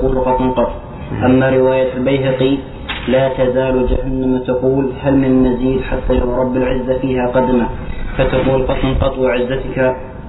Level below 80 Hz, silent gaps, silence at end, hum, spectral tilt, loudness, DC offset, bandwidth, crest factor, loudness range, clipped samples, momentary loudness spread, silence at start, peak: -26 dBFS; none; 0 s; none; -11 dB/octave; -15 LUFS; under 0.1%; 4.1 kHz; 12 dB; 1 LU; under 0.1%; 6 LU; 0 s; -2 dBFS